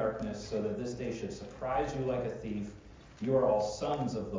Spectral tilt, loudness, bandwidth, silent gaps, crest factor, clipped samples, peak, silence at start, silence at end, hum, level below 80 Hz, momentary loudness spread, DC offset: -6.5 dB/octave; -34 LUFS; 7.6 kHz; none; 16 dB; under 0.1%; -18 dBFS; 0 s; 0 s; none; -54 dBFS; 11 LU; under 0.1%